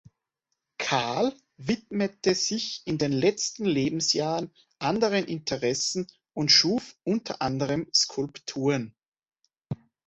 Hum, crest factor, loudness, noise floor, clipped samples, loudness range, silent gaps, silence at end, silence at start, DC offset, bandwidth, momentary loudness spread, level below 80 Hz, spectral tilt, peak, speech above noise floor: none; 22 dB; -26 LUFS; -82 dBFS; under 0.1%; 3 LU; 9.08-9.12 s; 0.3 s; 0.8 s; under 0.1%; 8.4 kHz; 10 LU; -62 dBFS; -3.5 dB/octave; -6 dBFS; 56 dB